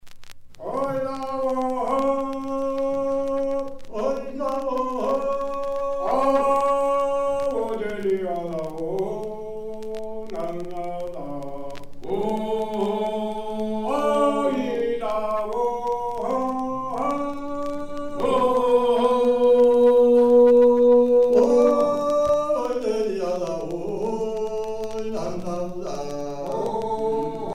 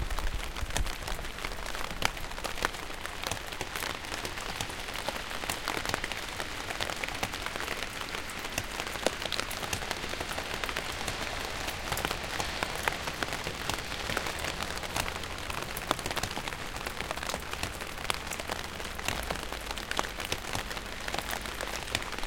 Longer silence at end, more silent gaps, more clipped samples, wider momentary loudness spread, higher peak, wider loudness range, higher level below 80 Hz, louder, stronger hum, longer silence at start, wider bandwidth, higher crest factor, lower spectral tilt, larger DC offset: about the same, 0 s vs 0 s; neither; neither; first, 15 LU vs 4 LU; about the same, -6 dBFS vs -4 dBFS; first, 12 LU vs 2 LU; about the same, -48 dBFS vs -44 dBFS; first, -23 LUFS vs -34 LUFS; neither; about the same, 0.05 s vs 0 s; second, 12 kHz vs 17 kHz; second, 16 dB vs 30 dB; first, -6 dB/octave vs -2.5 dB/octave; second, under 0.1% vs 0.2%